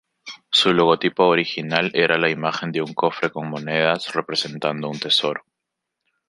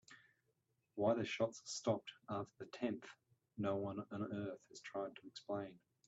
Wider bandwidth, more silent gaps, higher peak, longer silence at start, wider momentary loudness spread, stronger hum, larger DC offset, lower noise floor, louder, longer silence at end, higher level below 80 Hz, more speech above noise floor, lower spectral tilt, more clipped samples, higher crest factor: first, 11.5 kHz vs 8.2 kHz; neither; first, -2 dBFS vs -24 dBFS; first, 0.25 s vs 0.1 s; second, 9 LU vs 15 LU; neither; neither; about the same, -82 dBFS vs -84 dBFS; first, -20 LUFS vs -44 LUFS; first, 0.9 s vs 0.3 s; first, -66 dBFS vs -82 dBFS; first, 61 dB vs 41 dB; about the same, -4.5 dB/octave vs -5.5 dB/octave; neither; about the same, 20 dB vs 20 dB